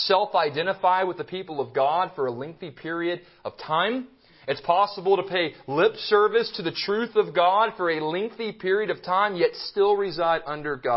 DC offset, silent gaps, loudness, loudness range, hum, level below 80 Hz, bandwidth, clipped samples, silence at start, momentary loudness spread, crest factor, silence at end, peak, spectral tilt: under 0.1%; none; -24 LUFS; 4 LU; none; -66 dBFS; 5.8 kHz; under 0.1%; 0 s; 11 LU; 18 dB; 0 s; -6 dBFS; -8.5 dB/octave